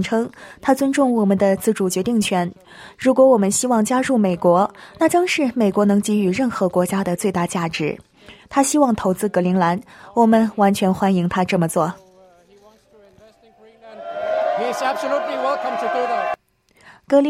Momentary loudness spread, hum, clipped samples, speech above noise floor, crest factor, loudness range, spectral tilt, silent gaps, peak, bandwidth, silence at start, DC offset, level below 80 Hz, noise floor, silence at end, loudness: 8 LU; none; under 0.1%; 38 dB; 16 dB; 7 LU; -5.5 dB/octave; none; -2 dBFS; 16 kHz; 0 s; under 0.1%; -56 dBFS; -56 dBFS; 0 s; -19 LUFS